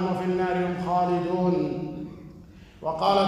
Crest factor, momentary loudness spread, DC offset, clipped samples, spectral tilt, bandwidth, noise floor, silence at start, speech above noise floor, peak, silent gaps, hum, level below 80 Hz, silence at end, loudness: 18 dB; 15 LU; under 0.1%; under 0.1%; -7.5 dB/octave; 11.5 kHz; -47 dBFS; 0 s; 24 dB; -8 dBFS; none; none; -54 dBFS; 0 s; -26 LUFS